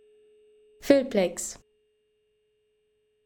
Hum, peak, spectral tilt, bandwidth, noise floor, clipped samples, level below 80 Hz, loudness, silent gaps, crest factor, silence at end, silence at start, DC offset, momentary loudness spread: none; -6 dBFS; -4.5 dB/octave; 19 kHz; -71 dBFS; under 0.1%; -62 dBFS; -25 LUFS; none; 24 dB; 1.7 s; 0.8 s; under 0.1%; 21 LU